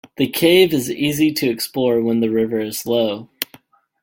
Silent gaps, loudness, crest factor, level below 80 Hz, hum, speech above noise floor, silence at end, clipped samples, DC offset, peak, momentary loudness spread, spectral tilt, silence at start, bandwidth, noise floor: none; -18 LUFS; 18 dB; -56 dBFS; none; 33 dB; 0.6 s; under 0.1%; under 0.1%; 0 dBFS; 11 LU; -4.5 dB/octave; 0.2 s; 17 kHz; -50 dBFS